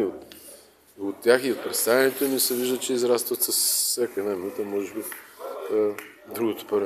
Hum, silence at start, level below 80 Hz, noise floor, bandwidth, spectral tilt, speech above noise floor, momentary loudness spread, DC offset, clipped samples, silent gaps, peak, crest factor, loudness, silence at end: none; 0 s; -74 dBFS; -50 dBFS; 14.5 kHz; -2 dB/octave; 26 dB; 17 LU; under 0.1%; under 0.1%; none; -4 dBFS; 22 dB; -24 LUFS; 0 s